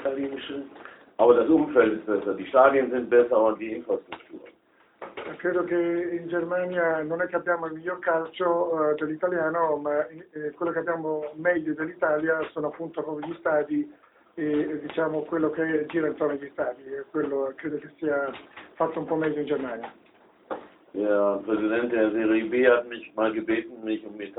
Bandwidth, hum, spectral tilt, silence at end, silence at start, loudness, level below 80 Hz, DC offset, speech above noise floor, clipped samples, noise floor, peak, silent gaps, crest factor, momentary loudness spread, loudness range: 4 kHz; none; -10 dB/octave; 0.05 s; 0 s; -26 LUFS; -68 dBFS; under 0.1%; 34 dB; under 0.1%; -59 dBFS; -4 dBFS; none; 22 dB; 16 LU; 7 LU